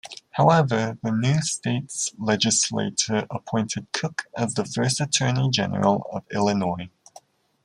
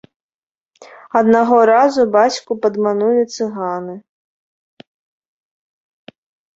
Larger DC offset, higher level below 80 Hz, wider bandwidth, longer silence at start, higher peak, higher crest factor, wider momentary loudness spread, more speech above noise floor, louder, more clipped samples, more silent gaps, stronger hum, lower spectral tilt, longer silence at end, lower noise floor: neither; about the same, -62 dBFS vs -64 dBFS; first, 12 kHz vs 8 kHz; second, 0.05 s vs 0.8 s; about the same, -4 dBFS vs -2 dBFS; about the same, 20 dB vs 16 dB; second, 8 LU vs 12 LU; second, 29 dB vs 53 dB; second, -23 LUFS vs -15 LUFS; neither; neither; neither; about the same, -4 dB/octave vs -5 dB/octave; second, 0.75 s vs 2.6 s; second, -52 dBFS vs -67 dBFS